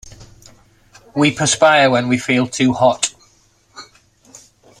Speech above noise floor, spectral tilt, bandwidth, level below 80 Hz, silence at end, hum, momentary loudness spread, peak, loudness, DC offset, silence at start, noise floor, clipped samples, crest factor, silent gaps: 41 dB; -4 dB/octave; 13 kHz; -52 dBFS; 0.95 s; none; 9 LU; -2 dBFS; -15 LUFS; under 0.1%; 0.05 s; -55 dBFS; under 0.1%; 16 dB; none